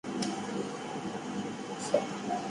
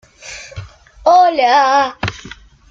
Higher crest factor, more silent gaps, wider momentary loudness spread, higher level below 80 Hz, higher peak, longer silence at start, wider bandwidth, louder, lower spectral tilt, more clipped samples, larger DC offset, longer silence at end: first, 22 dB vs 14 dB; neither; second, 6 LU vs 22 LU; second, -72 dBFS vs -46 dBFS; second, -12 dBFS vs -2 dBFS; second, 0.05 s vs 0.25 s; first, 11.5 kHz vs 7.8 kHz; second, -35 LUFS vs -13 LUFS; about the same, -4.5 dB/octave vs -4 dB/octave; neither; neither; second, 0 s vs 0.4 s